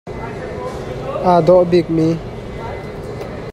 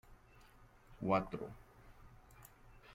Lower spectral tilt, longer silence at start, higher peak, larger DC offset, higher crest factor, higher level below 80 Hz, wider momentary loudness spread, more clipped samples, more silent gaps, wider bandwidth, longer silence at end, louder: about the same, -8 dB/octave vs -7.5 dB/octave; about the same, 0.05 s vs 0.1 s; first, 0 dBFS vs -20 dBFS; neither; second, 16 dB vs 24 dB; first, -38 dBFS vs -62 dBFS; second, 17 LU vs 27 LU; neither; neither; second, 11.5 kHz vs 16.5 kHz; about the same, 0 s vs 0 s; first, -17 LUFS vs -40 LUFS